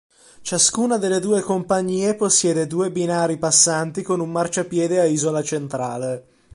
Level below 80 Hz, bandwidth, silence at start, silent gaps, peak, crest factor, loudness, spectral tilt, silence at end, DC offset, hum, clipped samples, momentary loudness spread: -60 dBFS; 11.5 kHz; 0.4 s; none; -2 dBFS; 18 dB; -19 LUFS; -3.5 dB/octave; 0.35 s; under 0.1%; none; under 0.1%; 9 LU